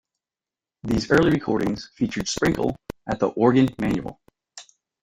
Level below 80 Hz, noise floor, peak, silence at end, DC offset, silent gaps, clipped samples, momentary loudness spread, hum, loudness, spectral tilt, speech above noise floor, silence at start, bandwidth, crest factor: -46 dBFS; under -90 dBFS; -2 dBFS; 0.4 s; under 0.1%; none; under 0.1%; 11 LU; none; -22 LUFS; -5.5 dB/octave; over 68 dB; 0.85 s; 16 kHz; 20 dB